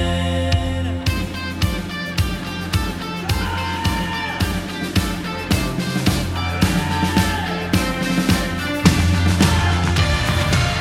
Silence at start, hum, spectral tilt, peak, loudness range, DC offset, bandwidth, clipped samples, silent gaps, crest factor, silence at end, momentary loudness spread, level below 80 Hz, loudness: 0 s; none; -5 dB/octave; 0 dBFS; 5 LU; under 0.1%; 16.5 kHz; under 0.1%; none; 20 dB; 0 s; 7 LU; -28 dBFS; -20 LUFS